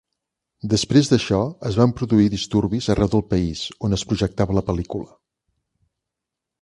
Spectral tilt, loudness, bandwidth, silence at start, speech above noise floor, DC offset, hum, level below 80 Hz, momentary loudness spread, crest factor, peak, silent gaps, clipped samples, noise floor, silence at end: -6 dB/octave; -20 LUFS; 11.5 kHz; 0.65 s; 64 dB; under 0.1%; none; -40 dBFS; 9 LU; 20 dB; -2 dBFS; none; under 0.1%; -84 dBFS; 1.55 s